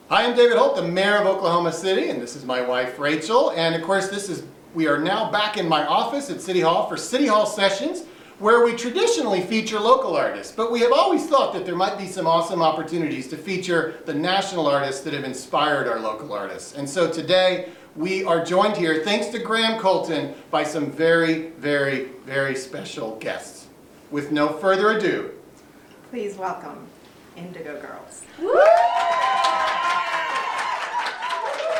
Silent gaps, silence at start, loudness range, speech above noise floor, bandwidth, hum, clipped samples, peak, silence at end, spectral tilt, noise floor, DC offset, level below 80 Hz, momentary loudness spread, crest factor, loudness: none; 0.1 s; 4 LU; 27 dB; 16.5 kHz; none; under 0.1%; -2 dBFS; 0 s; -4 dB/octave; -48 dBFS; under 0.1%; -66 dBFS; 13 LU; 18 dB; -21 LUFS